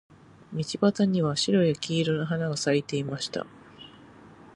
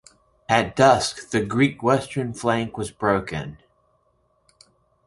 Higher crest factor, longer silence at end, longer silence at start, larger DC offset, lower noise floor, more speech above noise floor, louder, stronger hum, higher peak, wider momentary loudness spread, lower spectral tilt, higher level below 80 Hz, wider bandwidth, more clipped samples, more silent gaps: about the same, 18 dB vs 22 dB; second, 0.1 s vs 1.5 s; about the same, 0.5 s vs 0.5 s; neither; second, -50 dBFS vs -66 dBFS; second, 25 dB vs 44 dB; second, -26 LUFS vs -22 LUFS; neither; second, -10 dBFS vs -2 dBFS; first, 22 LU vs 14 LU; about the same, -5.5 dB/octave vs -5 dB/octave; second, -64 dBFS vs -52 dBFS; about the same, 11 kHz vs 11.5 kHz; neither; neither